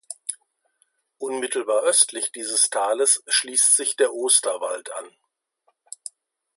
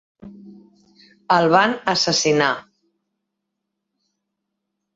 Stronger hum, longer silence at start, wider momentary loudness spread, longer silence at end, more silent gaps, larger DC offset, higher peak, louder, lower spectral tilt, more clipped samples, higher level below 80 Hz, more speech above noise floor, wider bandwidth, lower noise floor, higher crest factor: neither; second, 0.1 s vs 0.25 s; first, 18 LU vs 5 LU; second, 1.5 s vs 2.35 s; neither; neither; about the same, -2 dBFS vs -2 dBFS; about the same, -20 LUFS vs -18 LUFS; second, 1.5 dB/octave vs -3.5 dB/octave; neither; second, -86 dBFS vs -62 dBFS; second, 48 dB vs 62 dB; first, 12 kHz vs 7.8 kHz; second, -70 dBFS vs -79 dBFS; about the same, 22 dB vs 22 dB